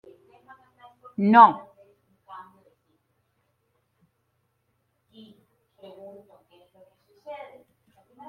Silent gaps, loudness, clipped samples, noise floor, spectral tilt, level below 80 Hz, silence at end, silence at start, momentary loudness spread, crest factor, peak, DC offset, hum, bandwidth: none; -17 LUFS; under 0.1%; -73 dBFS; -8.5 dB/octave; -80 dBFS; 0.95 s; 1.2 s; 31 LU; 26 dB; -2 dBFS; under 0.1%; none; 5.4 kHz